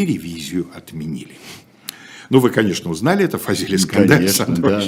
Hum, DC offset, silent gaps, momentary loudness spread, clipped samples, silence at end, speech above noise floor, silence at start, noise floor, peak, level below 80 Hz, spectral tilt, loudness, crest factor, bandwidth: none; under 0.1%; none; 21 LU; under 0.1%; 0 s; 19 dB; 0 s; -37 dBFS; 0 dBFS; -54 dBFS; -5 dB/octave; -17 LUFS; 18 dB; 19 kHz